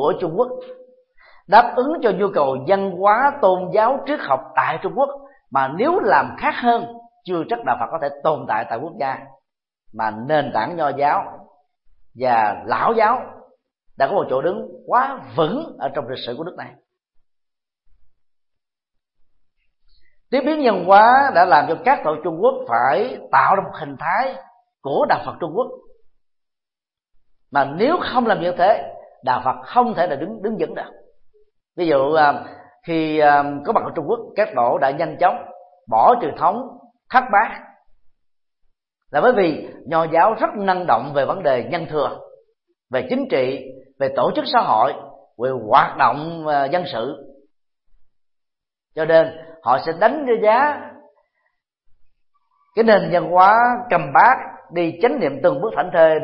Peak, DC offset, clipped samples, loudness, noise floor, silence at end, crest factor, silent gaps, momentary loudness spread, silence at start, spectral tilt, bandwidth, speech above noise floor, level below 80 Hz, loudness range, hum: 0 dBFS; under 0.1%; under 0.1%; -18 LUFS; -89 dBFS; 0 s; 20 dB; none; 12 LU; 0 s; -10 dB/octave; 5.8 kHz; 72 dB; -60 dBFS; 7 LU; none